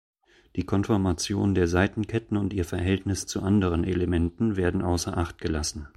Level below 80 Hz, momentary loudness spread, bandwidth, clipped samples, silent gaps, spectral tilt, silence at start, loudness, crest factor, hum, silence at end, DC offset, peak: -42 dBFS; 6 LU; 14 kHz; under 0.1%; none; -6 dB/octave; 0.55 s; -26 LUFS; 18 dB; none; 0.1 s; under 0.1%; -8 dBFS